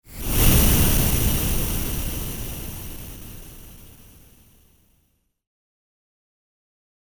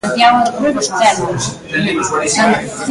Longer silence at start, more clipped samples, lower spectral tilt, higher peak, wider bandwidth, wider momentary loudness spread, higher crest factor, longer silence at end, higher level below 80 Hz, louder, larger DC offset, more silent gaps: about the same, 0.1 s vs 0.05 s; neither; about the same, -4 dB/octave vs -3.5 dB/octave; second, -4 dBFS vs 0 dBFS; first, over 20 kHz vs 11.5 kHz; first, 23 LU vs 8 LU; first, 20 dB vs 14 dB; first, 3.1 s vs 0 s; first, -28 dBFS vs -46 dBFS; second, -21 LUFS vs -14 LUFS; neither; neither